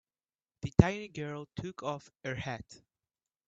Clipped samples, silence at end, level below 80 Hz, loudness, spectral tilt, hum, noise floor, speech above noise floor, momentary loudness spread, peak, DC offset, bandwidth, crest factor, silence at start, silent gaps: under 0.1%; 0.75 s; -50 dBFS; -34 LUFS; -7 dB/octave; none; under -90 dBFS; over 57 dB; 16 LU; -2 dBFS; under 0.1%; 7.8 kHz; 32 dB; 0.65 s; none